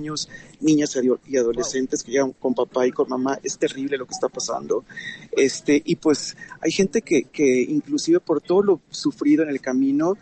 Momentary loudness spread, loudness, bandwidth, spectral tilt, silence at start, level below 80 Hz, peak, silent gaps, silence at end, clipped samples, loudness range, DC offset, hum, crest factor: 8 LU; -22 LUFS; 9 kHz; -4.5 dB/octave; 0 s; -58 dBFS; -8 dBFS; none; 0.05 s; under 0.1%; 3 LU; under 0.1%; none; 14 dB